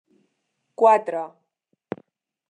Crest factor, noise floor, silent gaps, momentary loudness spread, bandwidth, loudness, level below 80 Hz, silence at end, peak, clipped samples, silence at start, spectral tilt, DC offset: 22 dB; -75 dBFS; none; 20 LU; 9 kHz; -20 LUFS; -82 dBFS; 1.2 s; -4 dBFS; under 0.1%; 0.8 s; -6 dB/octave; under 0.1%